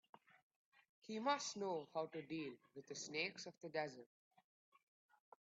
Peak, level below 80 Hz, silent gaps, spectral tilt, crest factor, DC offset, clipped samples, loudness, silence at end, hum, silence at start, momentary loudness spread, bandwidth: -26 dBFS; under -90 dBFS; none; -2.5 dB/octave; 24 dB; under 0.1%; under 0.1%; -46 LUFS; 1.35 s; none; 1.05 s; 12 LU; 8 kHz